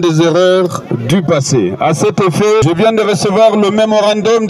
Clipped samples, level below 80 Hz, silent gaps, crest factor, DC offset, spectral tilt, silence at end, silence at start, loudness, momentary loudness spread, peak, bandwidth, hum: under 0.1%; -46 dBFS; none; 10 dB; under 0.1%; -5.5 dB/octave; 0 s; 0 s; -11 LUFS; 4 LU; 0 dBFS; 13 kHz; none